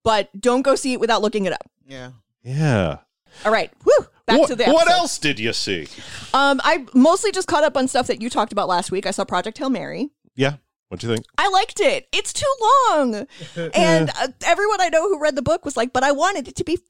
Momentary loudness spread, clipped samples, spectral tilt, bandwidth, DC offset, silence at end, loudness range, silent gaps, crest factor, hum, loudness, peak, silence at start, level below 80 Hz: 14 LU; under 0.1%; -4 dB/octave; 16 kHz; 1%; 0 s; 4 LU; 10.79-10.83 s; 16 dB; none; -19 LUFS; -4 dBFS; 0 s; -52 dBFS